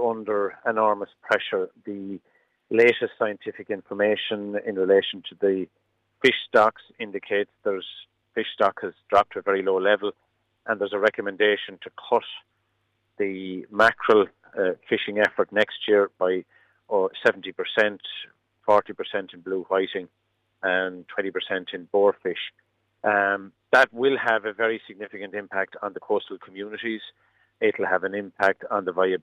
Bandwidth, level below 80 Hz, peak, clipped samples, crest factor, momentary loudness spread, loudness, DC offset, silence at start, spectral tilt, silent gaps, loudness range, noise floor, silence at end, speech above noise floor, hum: 9.8 kHz; -72 dBFS; -6 dBFS; under 0.1%; 18 dB; 15 LU; -24 LUFS; under 0.1%; 0 s; -5 dB/octave; none; 4 LU; -72 dBFS; 0.05 s; 48 dB; none